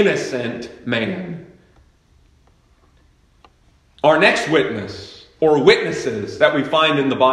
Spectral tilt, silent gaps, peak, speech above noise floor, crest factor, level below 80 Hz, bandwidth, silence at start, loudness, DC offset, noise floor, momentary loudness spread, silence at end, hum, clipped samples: -5 dB/octave; none; 0 dBFS; 38 dB; 20 dB; -56 dBFS; 11.5 kHz; 0 s; -17 LUFS; under 0.1%; -55 dBFS; 17 LU; 0 s; none; under 0.1%